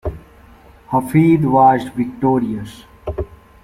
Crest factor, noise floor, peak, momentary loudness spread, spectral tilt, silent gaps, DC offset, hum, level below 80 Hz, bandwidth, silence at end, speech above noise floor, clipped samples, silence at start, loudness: 16 dB; -44 dBFS; -2 dBFS; 18 LU; -8.5 dB/octave; none; under 0.1%; none; -38 dBFS; 16 kHz; 0.3 s; 30 dB; under 0.1%; 0.05 s; -16 LUFS